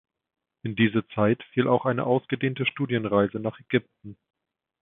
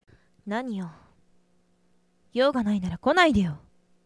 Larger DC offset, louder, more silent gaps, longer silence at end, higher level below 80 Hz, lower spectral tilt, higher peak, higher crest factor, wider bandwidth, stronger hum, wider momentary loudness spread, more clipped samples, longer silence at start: neither; about the same, -25 LUFS vs -25 LUFS; neither; first, 0.7 s vs 0.5 s; second, -62 dBFS vs -52 dBFS; first, -11 dB/octave vs -6 dB/octave; about the same, -6 dBFS vs -4 dBFS; about the same, 20 dB vs 24 dB; second, 3.9 kHz vs 11 kHz; neither; second, 5 LU vs 19 LU; neither; first, 0.65 s vs 0.45 s